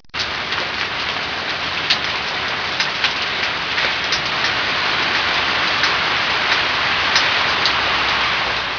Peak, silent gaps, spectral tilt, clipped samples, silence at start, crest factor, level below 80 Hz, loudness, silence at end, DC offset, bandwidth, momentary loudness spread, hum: -2 dBFS; none; -2 dB/octave; under 0.1%; 0.05 s; 18 dB; -46 dBFS; -17 LUFS; 0 s; under 0.1%; 5.4 kHz; 5 LU; none